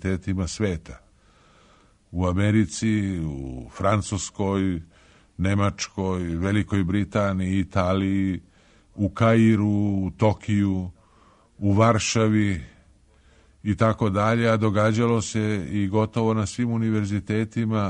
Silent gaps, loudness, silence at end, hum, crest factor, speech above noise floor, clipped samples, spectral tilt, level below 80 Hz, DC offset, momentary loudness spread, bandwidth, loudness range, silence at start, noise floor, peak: none; -23 LUFS; 0 s; none; 20 dB; 34 dB; under 0.1%; -6.5 dB/octave; -46 dBFS; under 0.1%; 9 LU; 9.8 kHz; 4 LU; 0 s; -57 dBFS; -4 dBFS